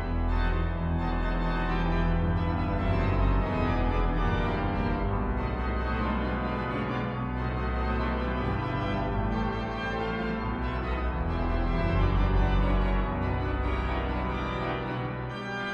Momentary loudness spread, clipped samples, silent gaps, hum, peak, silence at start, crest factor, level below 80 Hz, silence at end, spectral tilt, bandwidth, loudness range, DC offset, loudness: 5 LU; under 0.1%; none; none; -14 dBFS; 0 s; 14 dB; -32 dBFS; 0 s; -8.5 dB/octave; 6.4 kHz; 2 LU; under 0.1%; -29 LUFS